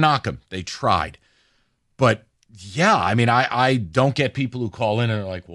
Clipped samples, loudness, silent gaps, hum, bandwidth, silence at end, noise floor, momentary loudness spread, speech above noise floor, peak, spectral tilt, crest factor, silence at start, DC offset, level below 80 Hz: under 0.1%; -21 LUFS; none; none; 11.5 kHz; 0 s; -66 dBFS; 11 LU; 45 dB; -4 dBFS; -5.5 dB/octave; 18 dB; 0 s; under 0.1%; -50 dBFS